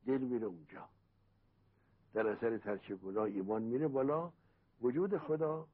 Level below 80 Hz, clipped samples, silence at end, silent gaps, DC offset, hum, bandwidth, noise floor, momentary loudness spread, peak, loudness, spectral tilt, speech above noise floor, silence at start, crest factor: -76 dBFS; under 0.1%; 0.1 s; none; under 0.1%; none; 4.4 kHz; -72 dBFS; 10 LU; -24 dBFS; -38 LUFS; -8 dB/octave; 36 dB; 0.05 s; 16 dB